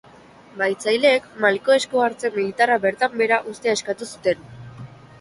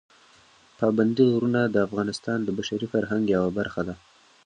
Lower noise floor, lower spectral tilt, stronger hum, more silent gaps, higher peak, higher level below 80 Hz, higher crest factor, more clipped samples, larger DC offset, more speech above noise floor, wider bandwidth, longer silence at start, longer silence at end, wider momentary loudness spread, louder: second, -47 dBFS vs -56 dBFS; second, -3.5 dB/octave vs -6.5 dB/octave; neither; neither; first, -4 dBFS vs -8 dBFS; second, -62 dBFS vs -56 dBFS; about the same, 18 dB vs 18 dB; neither; neither; second, 27 dB vs 32 dB; first, 11.5 kHz vs 10 kHz; second, 0.55 s vs 0.8 s; second, 0.35 s vs 0.5 s; first, 12 LU vs 9 LU; first, -20 LUFS vs -25 LUFS